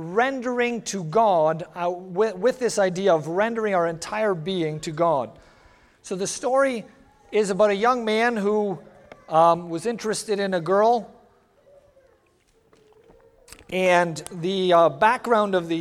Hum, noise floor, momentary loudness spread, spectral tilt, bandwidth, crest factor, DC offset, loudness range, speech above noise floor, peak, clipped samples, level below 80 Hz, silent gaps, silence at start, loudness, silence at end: none; -62 dBFS; 9 LU; -4.5 dB/octave; 14 kHz; 20 dB; under 0.1%; 5 LU; 40 dB; -4 dBFS; under 0.1%; -62 dBFS; none; 0 s; -22 LUFS; 0 s